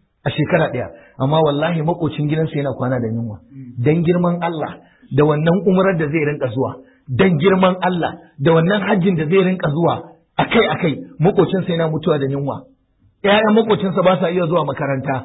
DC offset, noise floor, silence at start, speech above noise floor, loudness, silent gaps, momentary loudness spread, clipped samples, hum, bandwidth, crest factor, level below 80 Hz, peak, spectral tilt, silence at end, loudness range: under 0.1%; -57 dBFS; 0.25 s; 41 dB; -17 LUFS; none; 10 LU; under 0.1%; none; 4 kHz; 14 dB; -50 dBFS; -2 dBFS; -12.5 dB/octave; 0 s; 3 LU